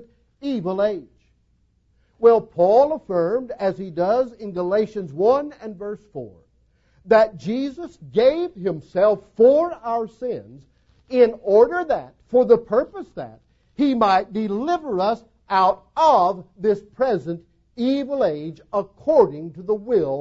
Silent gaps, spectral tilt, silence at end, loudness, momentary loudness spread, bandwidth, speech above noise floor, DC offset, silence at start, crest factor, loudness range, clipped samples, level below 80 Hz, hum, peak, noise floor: none; -7 dB/octave; 0 s; -20 LUFS; 16 LU; 7.4 kHz; 43 dB; under 0.1%; 0.4 s; 18 dB; 3 LU; under 0.1%; -58 dBFS; none; -4 dBFS; -63 dBFS